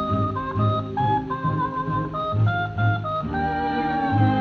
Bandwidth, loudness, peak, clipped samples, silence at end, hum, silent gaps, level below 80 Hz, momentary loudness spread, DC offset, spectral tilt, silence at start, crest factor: 4.7 kHz; -24 LUFS; -8 dBFS; under 0.1%; 0 s; none; none; -44 dBFS; 3 LU; under 0.1%; -9 dB/octave; 0 s; 14 dB